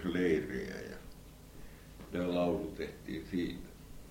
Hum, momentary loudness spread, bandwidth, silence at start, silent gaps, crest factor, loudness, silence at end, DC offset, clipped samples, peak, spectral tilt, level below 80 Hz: none; 22 LU; 16.5 kHz; 0 s; none; 18 dB; -36 LUFS; 0 s; under 0.1%; under 0.1%; -18 dBFS; -6.5 dB/octave; -54 dBFS